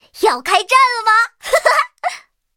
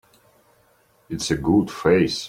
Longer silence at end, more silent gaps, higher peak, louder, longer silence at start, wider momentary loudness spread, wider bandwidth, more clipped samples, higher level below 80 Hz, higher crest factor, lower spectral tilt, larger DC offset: first, 0.4 s vs 0 s; neither; first, 0 dBFS vs -4 dBFS; first, -14 LUFS vs -21 LUFS; second, 0.15 s vs 1.1 s; first, 13 LU vs 10 LU; about the same, 17 kHz vs 16 kHz; neither; second, -56 dBFS vs -46 dBFS; about the same, 16 dB vs 20 dB; second, 0.5 dB/octave vs -5.5 dB/octave; neither